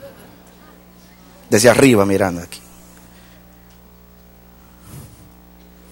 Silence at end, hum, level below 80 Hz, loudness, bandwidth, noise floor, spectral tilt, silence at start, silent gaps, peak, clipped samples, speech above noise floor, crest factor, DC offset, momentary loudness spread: 0.9 s; 60 Hz at -45 dBFS; -50 dBFS; -14 LUFS; 16.5 kHz; -45 dBFS; -4.5 dB/octave; 0.05 s; none; 0 dBFS; under 0.1%; 32 dB; 20 dB; under 0.1%; 29 LU